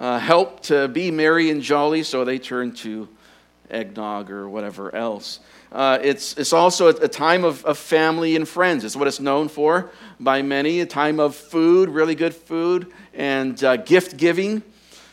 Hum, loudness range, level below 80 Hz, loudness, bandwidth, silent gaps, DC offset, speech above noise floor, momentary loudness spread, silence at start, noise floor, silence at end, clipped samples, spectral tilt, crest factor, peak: none; 8 LU; -66 dBFS; -20 LUFS; 16 kHz; none; under 0.1%; 33 dB; 14 LU; 0 s; -52 dBFS; 0.5 s; under 0.1%; -4.5 dB/octave; 20 dB; 0 dBFS